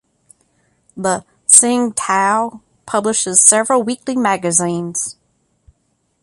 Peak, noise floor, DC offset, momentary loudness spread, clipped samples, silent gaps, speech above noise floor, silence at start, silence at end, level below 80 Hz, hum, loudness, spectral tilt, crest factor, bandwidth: 0 dBFS; -65 dBFS; under 0.1%; 13 LU; 0.1%; none; 49 dB; 0.95 s; 1.1 s; -60 dBFS; none; -13 LUFS; -2.5 dB/octave; 18 dB; 16 kHz